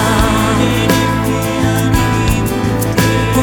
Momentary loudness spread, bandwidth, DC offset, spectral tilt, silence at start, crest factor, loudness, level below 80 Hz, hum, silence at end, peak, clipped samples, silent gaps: 3 LU; 20 kHz; under 0.1%; -5.5 dB/octave; 0 s; 12 dB; -13 LUFS; -24 dBFS; none; 0 s; 0 dBFS; under 0.1%; none